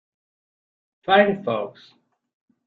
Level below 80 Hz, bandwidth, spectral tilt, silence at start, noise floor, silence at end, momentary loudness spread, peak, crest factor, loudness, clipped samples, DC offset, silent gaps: -68 dBFS; 4.9 kHz; -2.5 dB/octave; 1.1 s; under -90 dBFS; 0.95 s; 18 LU; -2 dBFS; 22 dB; -20 LUFS; under 0.1%; under 0.1%; none